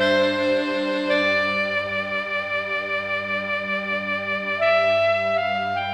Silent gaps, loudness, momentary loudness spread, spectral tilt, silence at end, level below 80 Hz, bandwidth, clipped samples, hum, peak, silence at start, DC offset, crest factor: none; -22 LUFS; 5 LU; -5 dB/octave; 0 s; -62 dBFS; 9.4 kHz; under 0.1%; none; -8 dBFS; 0 s; under 0.1%; 14 dB